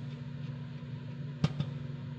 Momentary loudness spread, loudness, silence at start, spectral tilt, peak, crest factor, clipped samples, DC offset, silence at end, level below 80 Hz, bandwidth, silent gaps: 8 LU; -39 LUFS; 0 s; -7.5 dB/octave; -14 dBFS; 24 dB; under 0.1%; under 0.1%; 0 s; -62 dBFS; 8 kHz; none